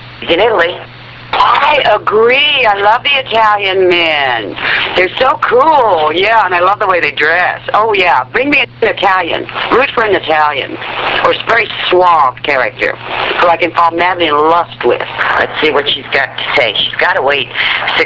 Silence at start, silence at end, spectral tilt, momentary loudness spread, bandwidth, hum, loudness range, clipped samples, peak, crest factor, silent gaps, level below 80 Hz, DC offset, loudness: 0 s; 0 s; -5 dB/octave; 6 LU; 7.8 kHz; none; 2 LU; under 0.1%; 0 dBFS; 10 dB; none; -44 dBFS; under 0.1%; -10 LUFS